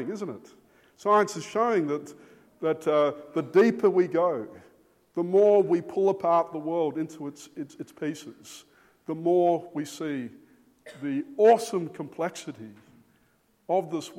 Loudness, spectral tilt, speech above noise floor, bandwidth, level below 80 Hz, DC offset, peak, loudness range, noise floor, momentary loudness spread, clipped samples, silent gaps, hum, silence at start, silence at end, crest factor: -26 LUFS; -6 dB/octave; 41 dB; 15 kHz; -78 dBFS; under 0.1%; -8 dBFS; 6 LU; -66 dBFS; 20 LU; under 0.1%; none; none; 0 s; 0 s; 18 dB